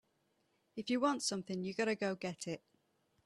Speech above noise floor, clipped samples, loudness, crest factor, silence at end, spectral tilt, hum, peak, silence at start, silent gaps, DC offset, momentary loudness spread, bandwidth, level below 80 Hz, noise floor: 41 dB; under 0.1%; -38 LUFS; 20 dB; 0.7 s; -4 dB/octave; none; -20 dBFS; 0.75 s; none; under 0.1%; 12 LU; 13 kHz; -80 dBFS; -79 dBFS